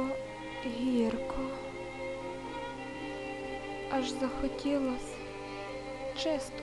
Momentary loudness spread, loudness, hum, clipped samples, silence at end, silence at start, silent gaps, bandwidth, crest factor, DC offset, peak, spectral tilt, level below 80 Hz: 9 LU; -36 LUFS; none; under 0.1%; 0 s; 0 s; none; 12 kHz; 16 dB; under 0.1%; -20 dBFS; -5 dB/octave; -52 dBFS